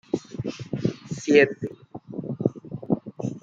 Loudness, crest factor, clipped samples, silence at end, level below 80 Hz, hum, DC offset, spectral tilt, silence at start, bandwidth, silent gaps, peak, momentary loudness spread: -26 LUFS; 24 dB; under 0.1%; 0.05 s; -62 dBFS; none; under 0.1%; -6.5 dB/octave; 0.15 s; 7.8 kHz; none; -2 dBFS; 17 LU